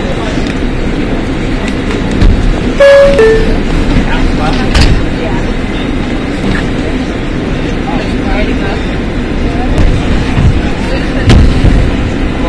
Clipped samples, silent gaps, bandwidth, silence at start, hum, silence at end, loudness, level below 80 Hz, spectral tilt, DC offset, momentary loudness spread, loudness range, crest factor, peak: 2%; none; 11 kHz; 0 s; none; 0 s; -11 LUFS; -12 dBFS; -6.5 dB/octave; under 0.1%; 8 LU; 5 LU; 8 dB; 0 dBFS